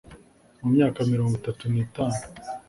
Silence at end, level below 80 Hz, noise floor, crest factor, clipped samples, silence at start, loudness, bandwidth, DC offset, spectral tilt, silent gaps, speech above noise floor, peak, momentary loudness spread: 0.1 s; -54 dBFS; -52 dBFS; 16 dB; under 0.1%; 0.1 s; -25 LUFS; 11.5 kHz; under 0.1%; -7.5 dB/octave; none; 28 dB; -8 dBFS; 10 LU